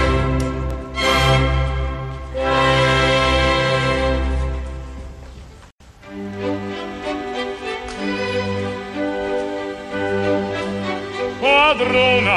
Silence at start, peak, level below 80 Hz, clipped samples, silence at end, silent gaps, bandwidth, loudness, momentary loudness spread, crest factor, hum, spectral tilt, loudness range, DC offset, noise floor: 0 s; -4 dBFS; -28 dBFS; under 0.1%; 0 s; 5.72-5.78 s; 13 kHz; -19 LUFS; 14 LU; 16 dB; none; -5 dB/octave; 10 LU; under 0.1%; -44 dBFS